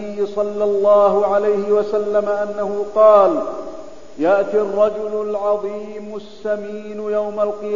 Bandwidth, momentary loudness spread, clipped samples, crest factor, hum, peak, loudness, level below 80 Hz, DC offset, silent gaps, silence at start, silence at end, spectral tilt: 7.4 kHz; 16 LU; under 0.1%; 16 dB; none; 0 dBFS; -17 LUFS; -56 dBFS; 2%; none; 0 s; 0 s; -6.5 dB/octave